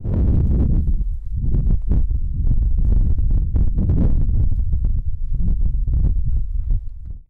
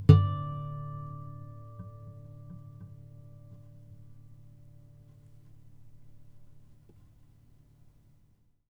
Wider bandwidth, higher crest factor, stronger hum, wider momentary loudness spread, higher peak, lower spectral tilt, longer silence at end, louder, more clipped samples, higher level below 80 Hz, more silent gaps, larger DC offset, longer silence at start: second, 1.5 kHz vs 5.2 kHz; second, 6 dB vs 30 dB; neither; second, 7 LU vs 22 LU; second, -10 dBFS vs -2 dBFS; first, -12.5 dB/octave vs -10 dB/octave; second, 0.1 s vs 2.1 s; first, -22 LUFS vs -31 LUFS; neither; first, -18 dBFS vs -52 dBFS; neither; neither; about the same, 0 s vs 0 s